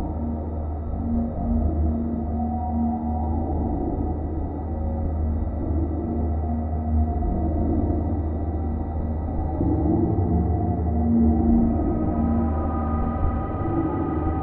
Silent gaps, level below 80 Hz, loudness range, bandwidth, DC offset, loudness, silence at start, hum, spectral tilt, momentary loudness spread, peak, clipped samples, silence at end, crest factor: none; -28 dBFS; 4 LU; 2.5 kHz; under 0.1%; -25 LUFS; 0 s; none; -12.5 dB/octave; 6 LU; -8 dBFS; under 0.1%; 0 s; 14 dB